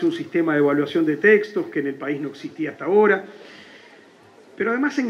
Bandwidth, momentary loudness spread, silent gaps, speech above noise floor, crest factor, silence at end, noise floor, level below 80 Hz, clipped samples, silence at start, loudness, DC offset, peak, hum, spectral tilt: 7.2 kHz; 13 LU; none; 29 dB; 18 dB; 0 s; -49 dBFS; -76 dBFS; under 0.1%; 0 s; -21 LUFS; under 0.1%; -4 dBFS; none; -6.5 dB/octave